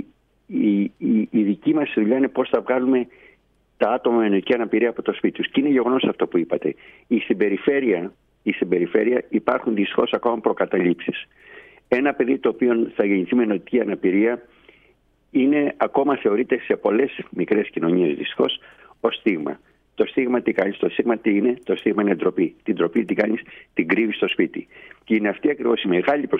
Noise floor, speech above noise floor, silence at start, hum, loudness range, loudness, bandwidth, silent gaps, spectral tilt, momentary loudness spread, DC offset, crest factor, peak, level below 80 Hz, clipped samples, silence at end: -60 dBFS; 40 dB; 0 s; none; 1 LU; -21 LUFS; 4.5 kHz; none; -8.5 dB/octave; 6 LU; under 0.1%; 18 dB; -4 dBFS; -64 dBFS; under 0.1%; 0 s